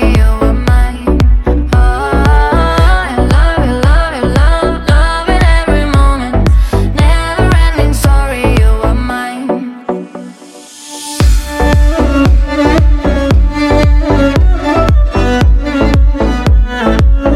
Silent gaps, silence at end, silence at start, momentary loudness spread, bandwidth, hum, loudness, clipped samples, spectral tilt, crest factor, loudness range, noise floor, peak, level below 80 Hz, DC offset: none; 0 s; 0 s; 7 LU; 13 kHz; none; -11 LUFS; under 0.1%; -6.5 dB/octave; 8 dB; 4 LU; -33 dBFS; 0 dBFS; -10 dBFS; under 0.1%